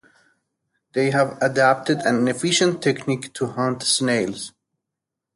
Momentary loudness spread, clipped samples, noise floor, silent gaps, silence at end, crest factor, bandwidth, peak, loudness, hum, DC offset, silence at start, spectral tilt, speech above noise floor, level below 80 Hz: 10 LU; under 0.1%; -84 dBFS; none; 0.85 s; 18 dB; 11.5 kHz; -4 dBFS; -21 LUFS; none; under 0.1%; 0.95 s; -4 dB/octave; 64 dB; -64 dBFS